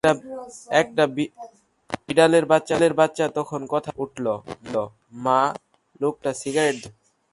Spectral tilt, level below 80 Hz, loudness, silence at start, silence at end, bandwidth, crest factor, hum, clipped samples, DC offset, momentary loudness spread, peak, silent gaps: -5 dB/octave; -60 dBFS; -22 LUFS; 0.05 s; 0.45 s; 11.5 kHz; 20 dB; none; under 0.1%; under 0.1%; 15 LU; -2 dBFS; none